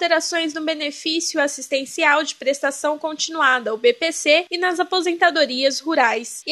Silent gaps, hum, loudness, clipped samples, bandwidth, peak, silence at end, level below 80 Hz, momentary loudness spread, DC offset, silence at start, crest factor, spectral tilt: none; none; -19 LUFS; under 0.1%; 12.5 kHz; -2 dBFS; 0 s; -80 dBFS; 7 LU; under 0.1%; 0 s; 18 dB; 0 dB/octave